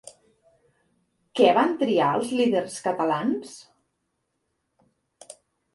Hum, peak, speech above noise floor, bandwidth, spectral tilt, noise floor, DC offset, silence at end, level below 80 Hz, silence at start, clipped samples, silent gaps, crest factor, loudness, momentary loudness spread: none; -4 dBFS; 54 dB; 11.5 kHz; -5 dB/octave; -77 dBFS; under 0.1%; 0.4 s; -72 dBFS; 0.05 s; under 0.1%; none; 22 dB; -23 LUFS; 12 LU